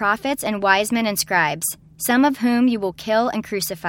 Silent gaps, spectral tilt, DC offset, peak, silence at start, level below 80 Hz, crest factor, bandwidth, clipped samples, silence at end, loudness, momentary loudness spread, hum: none; -3.5 dB/octave; under 0.1%; -2 dBFS; 0 s; -56 dBFS; 18 dB; 17.5 kHz; under 0.1%; 0 s; -20 LUFS; 7 LU; none